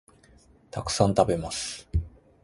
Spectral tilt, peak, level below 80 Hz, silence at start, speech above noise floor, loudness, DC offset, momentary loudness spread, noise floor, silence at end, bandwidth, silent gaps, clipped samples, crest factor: -5 dB/octave; -6 dBFS; -40 dBFS; 0.75 s; 31 dB; -27 LUFS; under 0.1%; 15 LU; -57 dBFS; 0.35 s; 11.5 kHz; none; under 0.1%; 22 dB